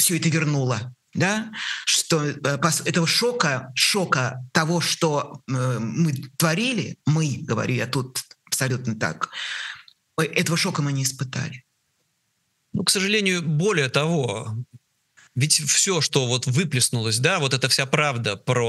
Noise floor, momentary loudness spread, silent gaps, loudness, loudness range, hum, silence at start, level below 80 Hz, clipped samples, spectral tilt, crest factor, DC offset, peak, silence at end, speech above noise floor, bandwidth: -72 dBFS; 10 LU; none; -22 LUFS; 5 LU; none; 0 s; -66 dBFS; under 0.1%; -3.5 dB/octave; 22 dB; under 0.1%; -2 dBFS; 0 s; 49 dB; 13 kHz